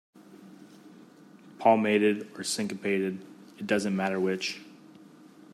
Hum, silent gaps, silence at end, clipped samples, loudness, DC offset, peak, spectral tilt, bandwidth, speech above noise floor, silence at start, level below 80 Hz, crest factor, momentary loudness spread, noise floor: none; none; 0.8 s; under 0.1%; -28 LUFS; under 0.1%; -8 dBFS; -4.5 dB/octave; 14 kHz; 26 dB; 0.3 s; -78 dBFS; 22 dB; 17 LU; -53 dBFS